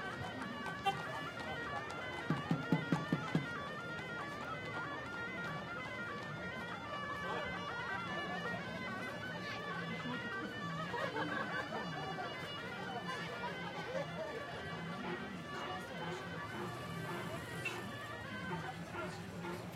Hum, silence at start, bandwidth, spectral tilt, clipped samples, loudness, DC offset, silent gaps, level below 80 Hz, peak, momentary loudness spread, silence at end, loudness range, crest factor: none; 0 s; 16 kHz; -5.5 dB/octave; under 0.1%; -42 LUFS; under 0.1%; none; -70 dBFS; -20 dBFS; 6 LU; 0 s; 4 LU; 22 dB